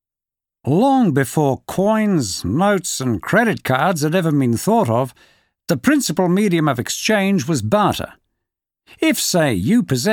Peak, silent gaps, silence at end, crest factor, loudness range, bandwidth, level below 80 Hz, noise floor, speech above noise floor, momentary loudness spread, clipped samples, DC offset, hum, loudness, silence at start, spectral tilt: -2 dBFS; none; 0 s; 16 dB; 1 LU; 19 kHz; -50 dBFS; -88 dBFS; 72 dB; 5 LU; under 0.1%; under 0.1%; none; -17 LUFS; 0.65 s; -5 dB/octave